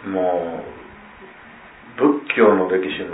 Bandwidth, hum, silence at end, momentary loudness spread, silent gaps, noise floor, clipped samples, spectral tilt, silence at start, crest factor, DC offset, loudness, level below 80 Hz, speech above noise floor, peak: 4 kHz; none; 0 s; 22 LU; none; -43 dBFS; under 0.1%; -10 dB/octave; 0 s; 20 dB; under 0.1%; -19 LUFS; -58 dBFS; 24 dB; -2 dBFS